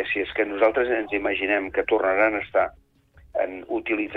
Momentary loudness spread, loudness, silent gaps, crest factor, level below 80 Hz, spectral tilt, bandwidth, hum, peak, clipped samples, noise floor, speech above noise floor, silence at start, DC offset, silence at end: 8 LU; -24 LUFS; none; 16 dB; -54 dBFS; -7 dB/octave; 5 kHz; none; -8 dBFS; under 0.1%; -53 dBFS; 30 dB; 0 s; under 0.1%; 0 s